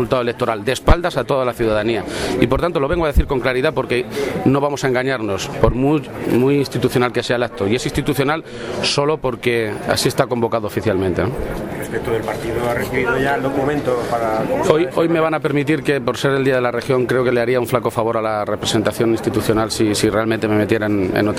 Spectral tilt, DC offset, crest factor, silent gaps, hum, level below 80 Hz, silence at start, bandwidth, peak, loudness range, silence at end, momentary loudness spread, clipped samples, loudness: -5.5 dB/octave; under 0.1%; 18 dB; none; none; -32 dBFS; 0 s; 16 kHz; 0 dBFS; 2 LU; 0 s; 4 LU; under 0.1%; -18 LUFS